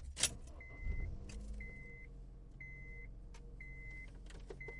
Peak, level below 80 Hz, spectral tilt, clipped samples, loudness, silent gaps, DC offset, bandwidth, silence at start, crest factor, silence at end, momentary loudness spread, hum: -16 dBFS; -50 dBFS; -2 dB/octave; under 0.1%; -47 LUFS; none; under 0.1%; 11.5 kHz; 0 s; 32 dB; 0 s; 18 LU; none